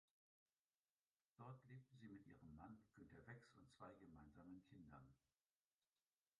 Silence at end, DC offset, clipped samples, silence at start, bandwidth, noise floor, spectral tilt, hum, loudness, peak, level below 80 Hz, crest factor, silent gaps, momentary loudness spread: 1.2 s; under 0.1%; under 0.1%; 1.4 s; 7 kHz; under -90 dBFS; -7 dB/octave; none; -65 LUFS; -48 dBFS; -82 dBFS; 20 dB; none; 3 LU